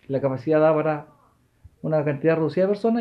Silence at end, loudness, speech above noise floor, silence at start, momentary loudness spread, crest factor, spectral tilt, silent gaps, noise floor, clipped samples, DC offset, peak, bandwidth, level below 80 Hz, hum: 0 s; -22 LUFS; 39 dB; 0.1 s; 8 LU; 14 dB; -9.5 dB/octave; none; -60 dBFS; under 0.1%; under 0.1%; -8 dBFS; 6 kHz; -62 dBFS; none